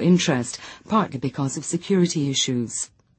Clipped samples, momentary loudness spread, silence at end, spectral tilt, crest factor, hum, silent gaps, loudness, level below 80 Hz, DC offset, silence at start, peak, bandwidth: under 0.1%; 9 LU; 0.3 s; -4.5 dB/octave; 16 dB; none; none; -23 LUFS; -60 dBFS; under 0.1%; 0 s; -6 dBFS; 8.8 kHz